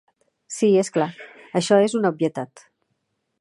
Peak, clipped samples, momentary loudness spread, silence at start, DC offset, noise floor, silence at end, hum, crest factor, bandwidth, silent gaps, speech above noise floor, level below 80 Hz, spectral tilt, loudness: -4 dBFS; under 0.1%; 17 LU; 0.5 s; under 0.1%; -74 dBFS; 0.95 s; none; 20 dB; 11.5 kHz; none; 54 dB; -74 dBFS; -5.5 dB/octave; -21 LUFS